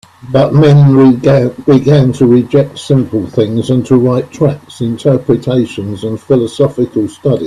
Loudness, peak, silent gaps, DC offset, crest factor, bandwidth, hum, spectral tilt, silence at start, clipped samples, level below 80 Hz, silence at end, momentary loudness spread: -11 LUFS; 0 dBFS; none; under 0.1%; 10 dB; 10.5 kHz; none; -8.5 dB/octave; 0.25 s; under 0.1%; -44 dBFS; 0 s; 9 LU